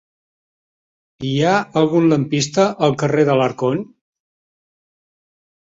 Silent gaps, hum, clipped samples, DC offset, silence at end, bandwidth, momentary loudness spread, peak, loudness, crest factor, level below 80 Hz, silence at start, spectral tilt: none; none; under 0.1%; under 0.1%; 1.75 s; 8 kHz; 8 LU; -2 dBFS; -17 LUFS; 18 dB; -58 dBFS; 1.2 s; -6 dB/octave